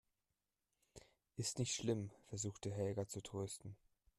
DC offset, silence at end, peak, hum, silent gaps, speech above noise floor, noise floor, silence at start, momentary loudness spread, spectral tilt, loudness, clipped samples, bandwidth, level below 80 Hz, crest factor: under 0.1%; 0.45 s; -26 dBFS; none; none; over 46 dB; under -90 dBFS; 0.95 s; 23 LU; -4.5 dB/octave; -44 LUFS; under 0.1%; 14 kHz; -74 dBFS; 20 dB